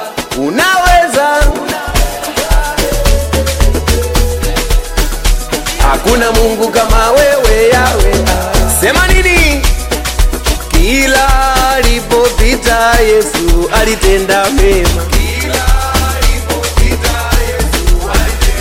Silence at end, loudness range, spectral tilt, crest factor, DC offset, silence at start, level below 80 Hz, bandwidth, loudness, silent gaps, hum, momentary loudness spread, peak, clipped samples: 0 s; 4 LU; -4 dB/octave; 10 dB; under 0.1%; 0 s; -12 dBFS; 16.5 kHz; -11 LUFS; none; none; 6 LU; 0 dBFS; under 0.1%